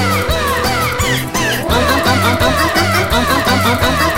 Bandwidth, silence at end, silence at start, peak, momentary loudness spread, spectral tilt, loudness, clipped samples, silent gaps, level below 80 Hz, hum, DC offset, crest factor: 17 kHz; 0 s; 0 s; 0 dBFS; 3 LU; -4 dB/octave; -13 LUFS; under 0.1%; none; -26 dBFS; none; 0.8%; 12 dB